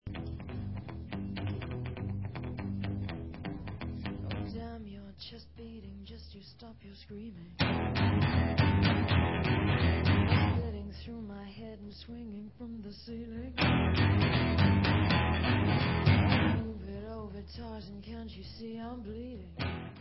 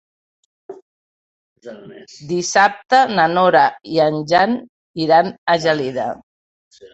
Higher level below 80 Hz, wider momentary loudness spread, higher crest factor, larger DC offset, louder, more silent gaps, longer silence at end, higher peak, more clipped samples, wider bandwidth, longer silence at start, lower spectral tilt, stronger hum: first, -42 dBFS vs -60 dBFS; first, 20 LU vs 17 LU; about the same, 18 dB vs 18 dB; first, 0.1% vs under 0.1%; second, -31 LUFS vs -16 LUFS; second, none vs 0.82-1.56 s, 4.69-4.94 s, 5.38-5.46 s, 6.23-6.71 s; about the same, 0 s vs 0.05 s; second, -14 dBFS vs -2 dBFS; neither; second, 5.8 kHz vs 8.2 kHz; second, 0.05 s vs 0.7 s; first, -10.5 dB/octave vs -4 dB/octave; neither